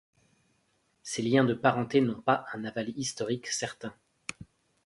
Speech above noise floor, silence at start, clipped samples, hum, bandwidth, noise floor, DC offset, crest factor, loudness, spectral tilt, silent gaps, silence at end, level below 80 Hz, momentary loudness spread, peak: 43 dB; 1.05 s; under 0.1%; none; 11.5 kHz; -72 dBFS; under 0.1%; 22 dB; -29 LUFS; -4.5 dB/octave; none; 0.4 s; -68 dBFS; 17 LU; -8 dBFS